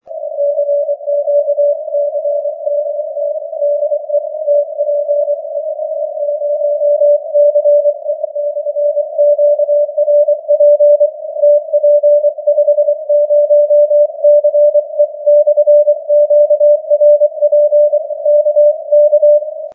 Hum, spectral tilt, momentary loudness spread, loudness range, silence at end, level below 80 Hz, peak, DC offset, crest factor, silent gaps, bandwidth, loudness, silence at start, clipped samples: none; -8 dB/octave; 9 LU; 6 LU; 0 s; -88 dBFS; -2 dBFS; under 0.1%; 10 dB; none; 0.8 kHz; -12 LUFS; 0.05 s; under 0.1%